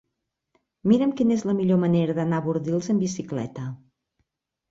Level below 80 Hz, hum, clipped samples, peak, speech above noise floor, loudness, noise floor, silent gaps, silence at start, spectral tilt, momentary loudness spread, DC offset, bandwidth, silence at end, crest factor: -62 dBFS; none; under 0.1%; -6 dBFS; 58 dB; -24 LUFS; -80 dBFS; none; 0.85 s; -7.5 dB/octave; 10 LU; under 0.1%; 7.8 kHz; 0.95 s; 18 dB